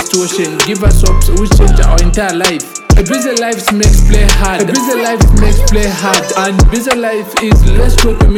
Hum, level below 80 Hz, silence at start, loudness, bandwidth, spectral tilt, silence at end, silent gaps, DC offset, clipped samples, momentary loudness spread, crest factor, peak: none; -10 dBFS; 0 s; -11 LUFS; 16.5 kHz; -4.5 dB/octave; 0 s; none; under 0.1%; under 0.1%; 4 LU; 8 dB; 0 dBFS